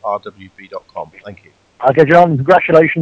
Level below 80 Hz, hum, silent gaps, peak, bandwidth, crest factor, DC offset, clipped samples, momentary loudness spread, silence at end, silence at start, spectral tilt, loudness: -52 dBFS; none; none; 0 dBFS; 8 kHz; 14 dB; under 0.1%; 0.3%; 22 LU; 0 s; 0.05 s; -8 dB/octave; -11 LUFS